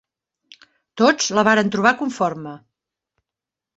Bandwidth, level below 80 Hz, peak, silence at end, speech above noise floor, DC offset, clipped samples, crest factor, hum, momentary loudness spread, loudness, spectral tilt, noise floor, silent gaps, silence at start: 8.2 kHz; -64 dBFS; -2 dBFS; 1.2 s; 69 dB; under 0.1%; under 0.1%; 20 dB; none; 11 LU; -18 LUFS; -3.5 dB/octave; -87 dBFS; none; 0.95 s